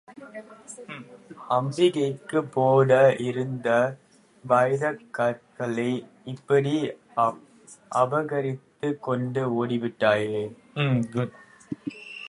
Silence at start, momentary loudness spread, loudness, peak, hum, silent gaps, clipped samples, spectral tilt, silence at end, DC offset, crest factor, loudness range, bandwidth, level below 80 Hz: 0.1 s; 19 LU; -25 LUFS; -6 dBFS; none; none; under 0.1%; -6.5 dB/octave; 0 s; under 0.1%; 20 dB; 4 LU; 11 kHz; -68 dBFS